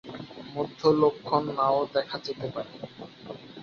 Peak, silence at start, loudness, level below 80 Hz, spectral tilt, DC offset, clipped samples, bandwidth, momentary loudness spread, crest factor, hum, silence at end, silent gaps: -8 dBFS; 0.05 s; -27 LUFS; -66 dBFS; -7 dB/octave; under 0.1%; under 0.1%; 7 kHz; 19 LU; 20 dB; none; 0 s; none